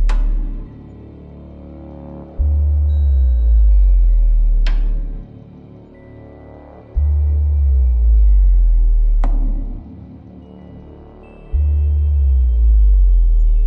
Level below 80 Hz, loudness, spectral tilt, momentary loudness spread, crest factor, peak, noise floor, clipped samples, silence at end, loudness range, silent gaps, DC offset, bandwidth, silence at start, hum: -14 dBFS; -17 LUFS; -9.5 dB/octave; 23 LU; 8 dB; -6 dBFS; -39 dBFS; under 0.1%; 0 s; 6 LU; none; under 0.1%; 3.3 kHz; 0 s; none